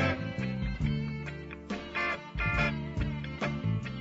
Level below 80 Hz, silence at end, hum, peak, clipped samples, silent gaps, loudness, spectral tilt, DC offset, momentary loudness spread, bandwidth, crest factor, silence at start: -42 dBFS; 0 s; none; -16 dBFS; under 0.1%; none; -33 LUFS; -7 dB/octave; under 0.1%; 9 LU; 8 kHz; 16 dB; 0 s